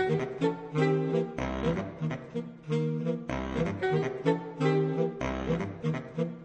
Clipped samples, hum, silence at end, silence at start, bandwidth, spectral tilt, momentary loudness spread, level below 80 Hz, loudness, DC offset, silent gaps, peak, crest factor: under 0.1%; none; 0 s; 0 s; 8.4 kHz; -7.5 dB/octave; 7 LU; -48 dBFS; -31 LUFS; under 0.1%; none; -12 dBFS; 18 dB